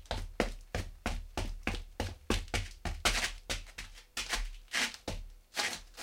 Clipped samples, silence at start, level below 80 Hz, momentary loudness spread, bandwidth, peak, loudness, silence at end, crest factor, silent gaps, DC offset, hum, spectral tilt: under 0.1%; 0 s; -42 dBFS; 10 LU; 16.5 kHz; -12 dBFS; -37 LUFS; 0 s; 26 dB; none; under 0.1%; none; -2.5 dB/octave